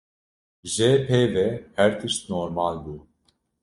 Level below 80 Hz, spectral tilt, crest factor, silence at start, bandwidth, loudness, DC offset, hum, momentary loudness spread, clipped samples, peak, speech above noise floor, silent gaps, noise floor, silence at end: -56 dBFS; -5 dB/octave; 20 dB; 0.65 s; 11.5 kHz; -23 LUFS; under 0.1%; none; 17 LU; under 0.1%; -4 dBFS; 46 dB; none; -69 dBFS; 0.65 s